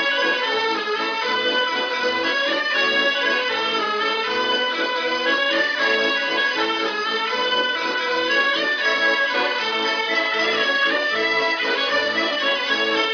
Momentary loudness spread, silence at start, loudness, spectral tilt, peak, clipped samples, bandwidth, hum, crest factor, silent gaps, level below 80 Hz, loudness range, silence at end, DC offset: 3 LU; 0 s; -19 LUFS; -1.5 dB/octave; -6 dBFS; under 0.1%; 5.4 kHz; none; 14 dB; none; -66 dBFS; 1 LU; 0 s; under 0.1%